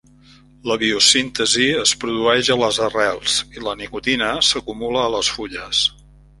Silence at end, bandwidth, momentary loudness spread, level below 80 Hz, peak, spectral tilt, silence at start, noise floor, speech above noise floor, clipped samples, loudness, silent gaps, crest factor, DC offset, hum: 0.5 s; 11.5 kHz; 11 LU; -48 dBFS; 0 dBFS; -1.5 dB/octave; 0.65 s; -48 dBFS; 30 dB; under 0.1%; -17 LUFS; none; 20 dB; under 0.1%; none